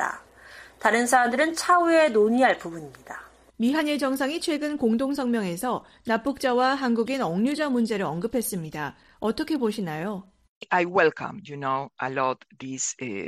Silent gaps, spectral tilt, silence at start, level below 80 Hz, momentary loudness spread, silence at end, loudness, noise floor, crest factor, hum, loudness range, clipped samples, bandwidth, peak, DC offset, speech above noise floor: 10.49-10.61 s; -4 dB/octave; 0 s; -62 dBFS; 15 LU; 0 s; -24 LUFS; -48 dBFS; 20 dB; none; 5 LU; under 0.1%; 15 kHz; -6 dBFS; under 0.1%; 23 dB